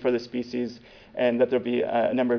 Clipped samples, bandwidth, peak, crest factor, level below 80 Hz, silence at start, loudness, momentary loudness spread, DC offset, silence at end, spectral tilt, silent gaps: under 0.1%; 5.4 kHz; -10 dBFS; 16 dB; -62 dBFS; 0 s; -26 LUFS; 12 LU; under 0.1%; 0 s; -7 dB/octave; none